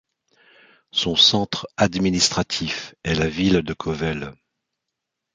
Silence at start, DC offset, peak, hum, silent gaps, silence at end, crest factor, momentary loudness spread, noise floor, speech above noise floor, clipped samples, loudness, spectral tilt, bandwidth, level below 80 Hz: 0.95 s; under 0.1%; -4 dBFS; none; none; 1 s; 20 dB; 13 LU; -82 dBFS; 60 dB; under 0.1%; -20 LUFS; -3.5 dB/octave; 9.6 kHz; -44 dBFS